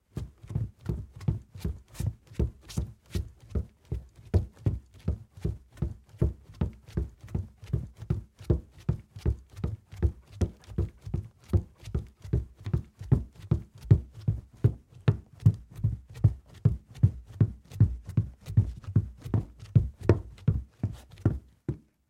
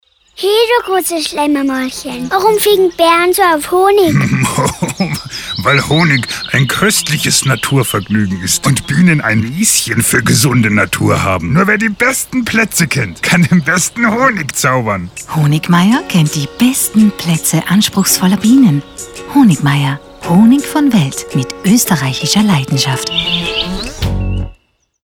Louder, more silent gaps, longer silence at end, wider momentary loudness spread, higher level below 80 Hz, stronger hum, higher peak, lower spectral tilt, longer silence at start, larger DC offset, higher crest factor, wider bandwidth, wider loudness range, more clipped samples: second, -32 LUFS vs -11 LUFS; neither; second, 0.3 s vs 0.55 s; about the same, 10 LU vs 8 LU; about the same, -40 dBFS vs -36 dBFS; neither; second, -4 dBFS vs 0 dBFS; first, -9 dB/octave vs -4.5 dB/octave; second, 0.15 s vs 0.4 s; neither; first, 26 dB vs 12 dB; second, 11 kHz vs over 20 kHz; first, 7 LU vs 2 LU; neither